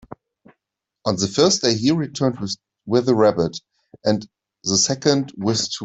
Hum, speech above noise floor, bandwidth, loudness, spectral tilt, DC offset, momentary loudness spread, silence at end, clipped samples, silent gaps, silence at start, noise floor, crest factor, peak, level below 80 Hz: none; 62 dB; 8.4 kHz; -20 LUFS; -4 dB/octave; under 0.1%; 12 LU; 0 s; under 0.1%; none; 0.1 s; -81 dBFS; 18 dB; -2 dBFS; -58 dBFS